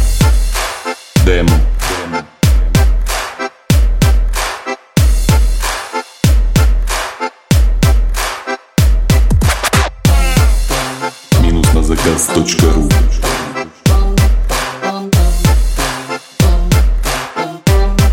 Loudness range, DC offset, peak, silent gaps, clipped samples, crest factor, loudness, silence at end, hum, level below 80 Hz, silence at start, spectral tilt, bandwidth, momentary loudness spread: 2 LU; under 0.1%; 0 dBFS; none; under 0.1%; 12 dB; -14 LUFS; 0 s; none; -14 dBFS; 0 s; -5 dB/octave; 17 kHz; 8 LU